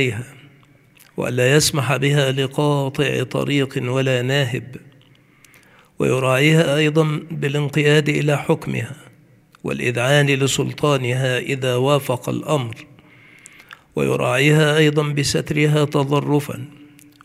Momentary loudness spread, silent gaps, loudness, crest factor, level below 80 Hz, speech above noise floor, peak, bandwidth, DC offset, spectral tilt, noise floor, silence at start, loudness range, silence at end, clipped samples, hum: 12 LU; none; -18 LUFS; 18 dB; -54 dBFS; 33 dB; -2 dBFS; 15.5 kHz; under 0.1%; -5 dB/octave; -51 dBFS; 0 s; 4 LU; 0.4 s; under 0.1%; none